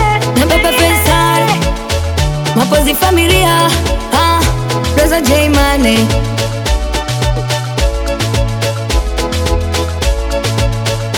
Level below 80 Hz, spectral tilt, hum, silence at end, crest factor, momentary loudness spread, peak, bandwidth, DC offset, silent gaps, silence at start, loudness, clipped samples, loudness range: -18 dBFS; -4.5 dB/octave; none; 0 s; 12 dB; 7 LU; 0 dBFS; over 20 kHz; under 0.1%; none; 0 s; -12 LUFS; under 0.1%; 5 LU